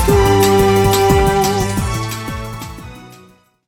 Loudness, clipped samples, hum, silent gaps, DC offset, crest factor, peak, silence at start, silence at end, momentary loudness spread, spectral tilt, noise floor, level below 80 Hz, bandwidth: -14 LUFS; under 0.1%; none; none; under 0.1%; 14 dB; 0 dBFS; 0 s; 0.55 s; 18 LU; -5 dB/octave; -47 dBFS; -26 dBFS; 19 kHz